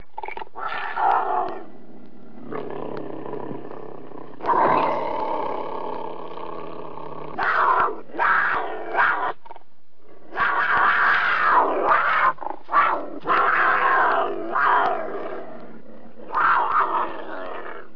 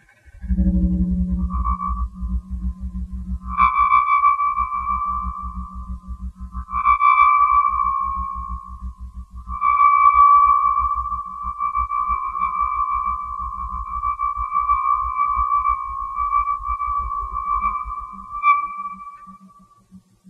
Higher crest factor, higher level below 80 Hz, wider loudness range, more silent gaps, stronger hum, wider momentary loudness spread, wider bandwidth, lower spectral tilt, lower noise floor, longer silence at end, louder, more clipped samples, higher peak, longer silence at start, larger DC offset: about the same, 16 dB vs 18 dB; second, -60 dBFS vs -30 dBFS; about the same, 8 LU vs 7 LU; neither; neither; about the same, 17 LU vs 19 LU; first, 5.4 kHz vs 3.9 kHz; second, -6 dB/octave vs -8 dB/octave; first, -59 dBFS vs -50 dBFS; second, 0.1 s vs 0.3 s; about the same, -21 LUFS vs -19 LUFS; neither; second, -6 dBFS vs -2 dBFS; about the same, 0.15 s vs 0.25 s; first, 3% vs under 0.1%